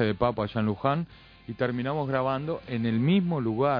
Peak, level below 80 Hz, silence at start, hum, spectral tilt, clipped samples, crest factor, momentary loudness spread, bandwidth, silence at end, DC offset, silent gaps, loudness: -8 dBFS; -54 dBFS; 0 s; none; -10 dB/octave; under 0.1%; 18 dB; 8 LU; 5.2 kHz; 0 s; under 0.1%; none; -27 LUFS